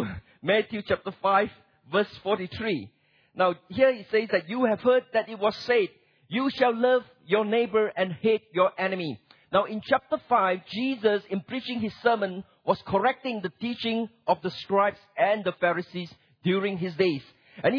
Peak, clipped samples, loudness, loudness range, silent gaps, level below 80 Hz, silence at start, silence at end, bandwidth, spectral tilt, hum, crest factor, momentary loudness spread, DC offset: -8 dBFS; under 0.1%; -26 LUFS; 3 LU; none; -64 dBFS; 0 s; 0 s; 5.4 kHz; -7 dB/octave; none; 18 dB; 9 LU; under 0.1%